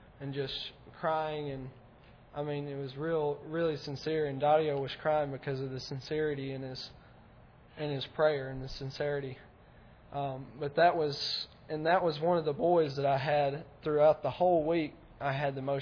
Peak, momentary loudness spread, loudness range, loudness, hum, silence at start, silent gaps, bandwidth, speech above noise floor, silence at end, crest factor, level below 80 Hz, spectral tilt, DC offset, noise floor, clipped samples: -12 dBFS; 13 LU; 7 LU; -32 LUFS; none; 0.2 s; none; 5.4 kHz; 25 dB; 0 s; 20 dB; -60 dBFS; -6.5 dB/octave; under 0.1%; -57 dBFS; under 0.1%